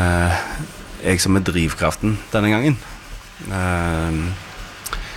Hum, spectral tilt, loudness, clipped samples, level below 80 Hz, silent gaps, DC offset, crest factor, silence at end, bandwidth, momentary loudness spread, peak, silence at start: none; -5 dB/octave; -20 LUFS; under 0.1%; -34 dBFS; none; under 0.1%; 16 dB; 0 s; 17 kHz; 17 LU; -4 dBFS; 0 s